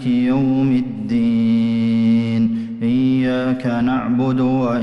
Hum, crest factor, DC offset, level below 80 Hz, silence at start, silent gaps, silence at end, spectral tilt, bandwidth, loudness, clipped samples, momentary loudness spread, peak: none; 8 dB; under 0.1%; -48 dBFS; 0 s; none; 0 s; -8.5 dB/octave; 6 kHz; -17 LUFS; under 0.1%; 4 LU; -8 dBFS